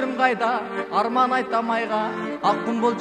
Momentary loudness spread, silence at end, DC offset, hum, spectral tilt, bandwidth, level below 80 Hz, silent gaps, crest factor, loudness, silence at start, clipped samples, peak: 5 LU; 0 s; under 0.1%; none; -5.5 dB/octave; 10 kHz; -68 dBFS; none; 18 dB; -22 LUFS; 0 s; under 0.1%; -4 dBFS